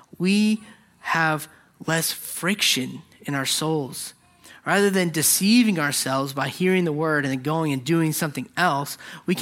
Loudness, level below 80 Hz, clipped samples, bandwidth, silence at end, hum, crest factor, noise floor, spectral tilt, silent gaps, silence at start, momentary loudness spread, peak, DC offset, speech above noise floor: -22 LUFS; -68 dBFS; under 0.1%; 16.5 kHz; 0 s; none; 18 dB; -50 dBFS; -3.5 dB/octave; none; 0.2 s; 14 LU; -4 dBFS; under 0.1%; 28 dB